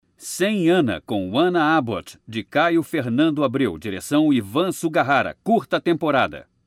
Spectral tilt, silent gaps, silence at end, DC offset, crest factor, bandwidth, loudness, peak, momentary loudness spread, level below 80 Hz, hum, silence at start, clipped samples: -5.5 dB/octave; none; 0.25 s; under 0.1%; 14 dB; 15.5 kHz; -21 LUFS; -6 dBFS; 7 LU; -58 dBFS; none; 0.2 s; under 0.1%